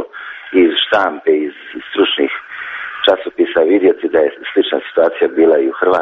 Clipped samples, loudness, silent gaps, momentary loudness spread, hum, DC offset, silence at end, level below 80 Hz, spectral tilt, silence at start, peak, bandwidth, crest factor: under 0.1%; -14 LUFS; none; 12 LU; none; under 0.1%; 0 s; -56 dBFS; -0.5 dB/octave; 0 s; 0 dBFS; 6 kHz; 14 dB